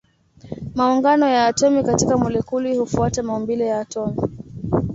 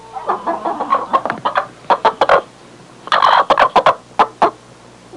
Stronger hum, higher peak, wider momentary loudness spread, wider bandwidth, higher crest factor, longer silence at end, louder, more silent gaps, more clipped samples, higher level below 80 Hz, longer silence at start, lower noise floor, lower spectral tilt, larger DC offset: neither; about the same, -4 dBFS vs -2 dBFS; first, 12 LU vs 9 LU; second, 8 kHz vs 11.5 kHz; about the same, 16 dB vs 14 dB; about the same, 0 s vs 0 s; second, -19 LUFS vs -15 LUFS; neither; neither; first, -42 dBFS vs -52 dBFS; first, 0.45 s vs 0.05 s; first, -46 dBFS vs -41 dBFS; first, -5.5 dB/octave vs -3.5 dB/octave; neither